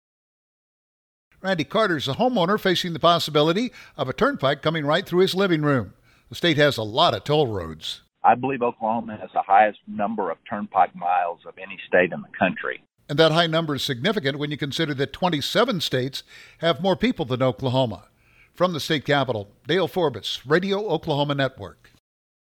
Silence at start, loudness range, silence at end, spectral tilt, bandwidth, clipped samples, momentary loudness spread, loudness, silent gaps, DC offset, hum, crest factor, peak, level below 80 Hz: 1.45 s; 3 LU; 0.8 s; -5.5 dB/octave; 19.5 kHz; under 0.1%; 11 LU; -22 LUFS; none; under 0.1%; none; 20 dB; -4 dBFS; -58 dBFS